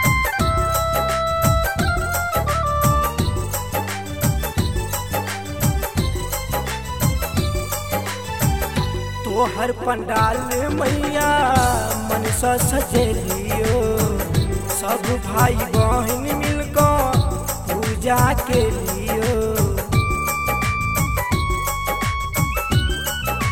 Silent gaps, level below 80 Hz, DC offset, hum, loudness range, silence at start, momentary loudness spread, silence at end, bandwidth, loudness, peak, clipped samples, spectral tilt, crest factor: none; -28 dBFS; 0.8%; none; 4 LU; 0 s; 6 LU; 0 s; 19.5 kHz; -20 LUFS; -2 dBFS; under 0.1%; -4.5 dB/octave; 18 dB